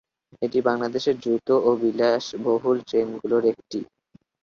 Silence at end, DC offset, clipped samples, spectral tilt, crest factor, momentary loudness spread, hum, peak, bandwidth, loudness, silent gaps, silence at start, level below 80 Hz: 0.6 s; under 0.1%; under 0.1%; -5.5 dB/octave; 16 dB; 11 LU; none; -6 dBFS; 7.2 kHz; -23 LUFS; none; 0.4 s; -66 dBFS